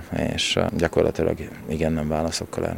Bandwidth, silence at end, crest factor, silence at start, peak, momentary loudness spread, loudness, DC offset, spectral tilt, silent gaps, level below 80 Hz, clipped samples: 16.5 kHz; 0 s; 20 dB; 0 s; -4 dBFS; 5 LU; -24 LUFS; under 0.1%; -5 dB/octave; none; -40 dBFS; under 0.1%